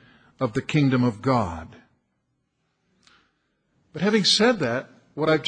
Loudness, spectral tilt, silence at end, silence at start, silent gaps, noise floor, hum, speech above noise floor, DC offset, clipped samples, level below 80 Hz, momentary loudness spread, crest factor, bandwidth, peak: -22 LUFS; -5 dB/octave; 0 s; 0.4 s; none; -74 dBFS; none; 52 dB; under 0.1%; under 0.1%; -54 dBFS; 14 LU; 18 dB; 10 kHz; -6 dBFS